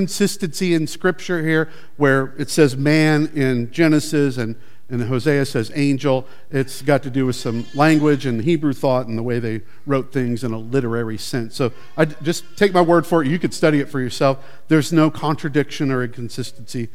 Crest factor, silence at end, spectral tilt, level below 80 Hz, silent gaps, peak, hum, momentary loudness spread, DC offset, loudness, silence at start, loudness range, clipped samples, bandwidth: 18 dB; 0.1 s; -6 dB/octave; -60 dBFS; none; 0 dBFS; none; 10 LU; 3%; -19 LUFS; 0 s; 4 LU; under 0.1%; 16 kHz